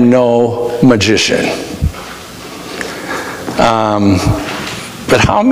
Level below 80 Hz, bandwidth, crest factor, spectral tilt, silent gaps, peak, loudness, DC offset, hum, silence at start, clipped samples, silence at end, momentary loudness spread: -32 dBFS; 16 kHz; 12 dB; -5 dB/octave; none; 0 dBFS; -13 LUFS; under 0.1%; none; 0 s; under 0.1%; 0 s; 16 LU